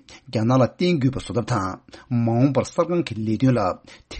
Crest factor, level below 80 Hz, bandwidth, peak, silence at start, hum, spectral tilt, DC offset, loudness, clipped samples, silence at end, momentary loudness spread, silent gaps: 16 dB; -50 dBFS; 8.8 kHz; -6 dBFS; 0.1 s; none; -7.5 dB/octave; under 0.1%; -22 LUFS; under 0.1%; 0 s; 9 LU; none